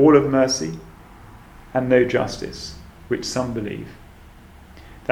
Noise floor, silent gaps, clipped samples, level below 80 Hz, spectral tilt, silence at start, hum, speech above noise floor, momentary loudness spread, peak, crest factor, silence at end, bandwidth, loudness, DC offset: -45 dBFS; none; under 0.1%; -46 dBFS; -5 dB/octave; 0 s; none; 25 dB; 18 LU; -2 dBFS; 20 dB; 0 s; 15 kHz; -21 LUFS; under 0.1%